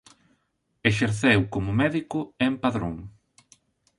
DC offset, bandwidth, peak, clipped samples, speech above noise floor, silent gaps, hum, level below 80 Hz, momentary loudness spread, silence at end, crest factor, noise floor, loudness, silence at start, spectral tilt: under 0.1%; 11.5 kHz; -4 dBFS; under 0.1%; 49 dB; none; none; -50 dBFS; 11 LU; 0.9 s; 22 dB; -73 dBFS; -24 LUFS; 0.85 s; -6 dB/octave